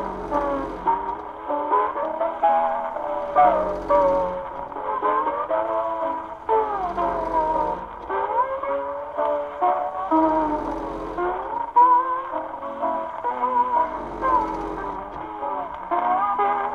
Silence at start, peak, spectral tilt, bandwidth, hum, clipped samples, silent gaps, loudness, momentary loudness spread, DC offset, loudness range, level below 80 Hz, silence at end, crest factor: 0 s; -6 dBFS; -7 dB/octave; 7 kHz; none; under 0.1%; none; -23 LUFS; 11 LU; under 0.1%; 3 LU; -48 dBFS; 0 s; 18 dB